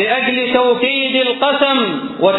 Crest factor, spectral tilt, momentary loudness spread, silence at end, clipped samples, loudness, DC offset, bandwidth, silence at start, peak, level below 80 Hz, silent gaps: 14 dB; -6.5 dB/octave; 3 LU; 0 s; under 0.1%; -14 LUFS; under 0.1%; 4.1 kHz; 0 s; 0 dBFS; -56 dBFS; none